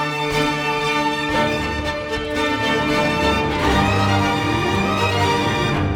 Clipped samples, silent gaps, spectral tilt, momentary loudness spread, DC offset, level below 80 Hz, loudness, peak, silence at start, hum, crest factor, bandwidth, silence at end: under 0.1%; none; -5 dB/octave; 4 LU; under 0.1%; -36 dBFS; -19 LUFS; -4 dBFS; 0 s; none; 14 dB; over 20 kHz; 0 s